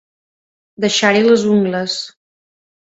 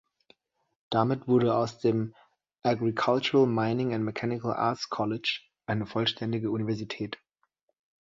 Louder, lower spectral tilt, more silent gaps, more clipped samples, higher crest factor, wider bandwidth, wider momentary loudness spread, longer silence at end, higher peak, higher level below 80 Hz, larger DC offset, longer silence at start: first, -15 LUFS vs -28 LUFS; second, -4 dB/octave vs -6.5 dB/octave; neither; neither; about the same, 18 dB vs 20 dB; about the same, 8 kHz vs 7.6 kHz; about the same, 11 LU vs 9 LU; about the same, 0.8 s vs 0.85 s; first, 0 dBFS vs -10 dBFS; first, -60 dBFS vs -66 dBFS; neither; about the same, 0.8 s vs 0.9 s